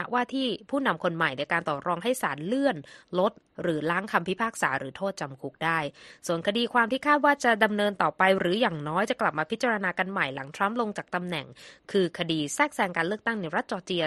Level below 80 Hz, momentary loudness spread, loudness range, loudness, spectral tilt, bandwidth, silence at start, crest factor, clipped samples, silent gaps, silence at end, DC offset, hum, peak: -68 dBFS; 9 LU; 4 LU; -27 LUFS; -4.5 dB/octave; 13 kHz; 0 s; 20 dB; under 0.1%; none; 0 s; under 0.1%; none; -6 dBFS